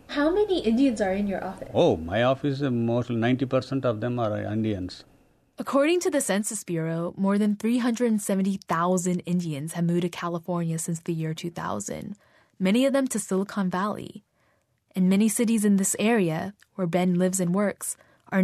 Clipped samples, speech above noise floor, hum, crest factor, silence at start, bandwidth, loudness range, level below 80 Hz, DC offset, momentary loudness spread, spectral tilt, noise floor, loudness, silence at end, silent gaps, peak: under 0.1%; 43 dB; none; 16 dB; 0.1 s; 13.5 kHz; 4 LU; -58 dBFS; under 0.1%; 10 LU; -5.5 dB/octave; -68 dBFS; -25 LUFS; 0 s; none; -10 dBFS